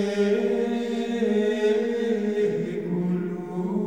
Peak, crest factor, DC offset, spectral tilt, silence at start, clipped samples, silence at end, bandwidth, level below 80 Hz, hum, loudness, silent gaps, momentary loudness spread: -12 dBFS; 12 dB; 0.2%; -7 dB/octave; 0 s; under 0.1%; 0 s; 9.8 kHz; -64 dBFS; none; -25 LUFS; none; 6 LU